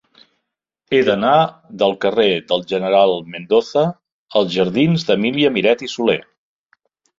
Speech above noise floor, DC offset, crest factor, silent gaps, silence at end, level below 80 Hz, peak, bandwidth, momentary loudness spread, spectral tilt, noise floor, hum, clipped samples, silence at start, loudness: 61 dB; under 0.1%; 16 dB; 4.12-4.26 s; 1 s; -58 dBFS; -2 dBFS; 7.6 kHz; 5 LU; -6 dB/octave; -77 dBFS; none; under 0.1%; 0.9 s; -17 LUFS